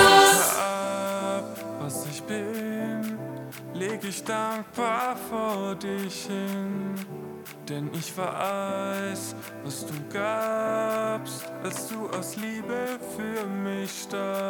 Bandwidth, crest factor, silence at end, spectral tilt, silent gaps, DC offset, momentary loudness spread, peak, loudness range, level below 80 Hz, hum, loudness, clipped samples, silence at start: 19 kHz; 24 dB; 0 s; -3 dB/octave; none; under 0.1%; 9 LU; -2 dBFS; 3 LU; -64 dBFS; none; -28 LUFS; under 0.1%; 0 s